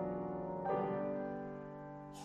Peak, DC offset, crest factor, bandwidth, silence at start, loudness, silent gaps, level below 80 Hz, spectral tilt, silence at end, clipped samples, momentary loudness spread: -26 dBFS; under 0.1%; 14 dB; 12.5 kHz; 0 s; -41 LUFS; none; -66 dBFS; -8 dB/octave; 0 s; under 0.1%; 12 LU